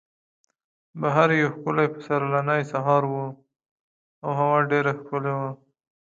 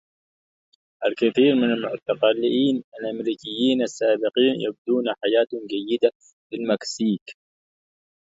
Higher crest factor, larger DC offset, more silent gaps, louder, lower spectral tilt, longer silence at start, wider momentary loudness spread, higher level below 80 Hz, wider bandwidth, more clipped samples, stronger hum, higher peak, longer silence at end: about the same, 22 dB vs 18 dB; neither; first, 3.71-4.22 s vs 2.84-2.92 s, 4.78-4.85 s, 6.15-6.20 s, 6.33-6.50 s, 7.21-7.26 s; about the same, -23 LUFS vs -23 LUFS; first, -7.5 dB/octave vs -5 dB/octave; about the same, 0.95 s vs 1 s; about the same, 11 LU vs 9 LU; about the same, -72 dBFS vs -70 dBFS; about the same, 7.6 kHz vs 7.8 kHz; neither; neither; about the same, -4 dBFS vs -6 dBFS; second, 0.6 s vs 1.05 s